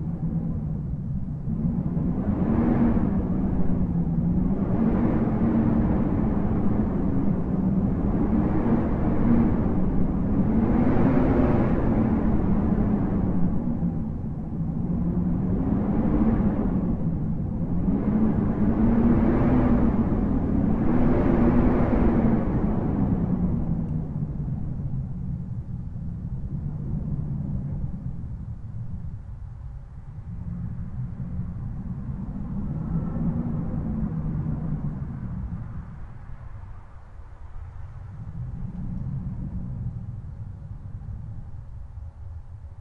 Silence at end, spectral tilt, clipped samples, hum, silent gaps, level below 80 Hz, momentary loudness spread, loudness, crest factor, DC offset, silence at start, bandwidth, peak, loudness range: 0 s; -12 dB/octave; under 0.1%; none; none; -32 dBFS; 17 LU; -25 LUFS; 16 dB; under 0.1%; 0 s; 3.9 kHz; -8 dBFS; 13 LU